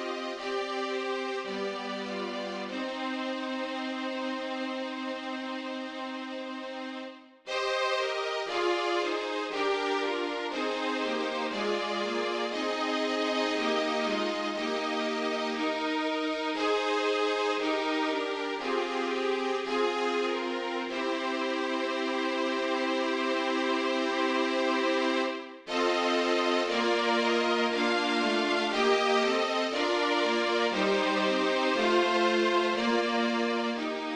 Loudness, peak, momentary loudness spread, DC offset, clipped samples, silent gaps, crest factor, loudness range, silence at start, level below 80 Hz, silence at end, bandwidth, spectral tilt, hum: -29 LUFS; -14 dBFS; 8 LU; under 0.1%; under 0.1%; none; 16 dB; 7 LU; 0 s; -70 dBFS; 0 s; 11 kHz; -3 dB/octave; none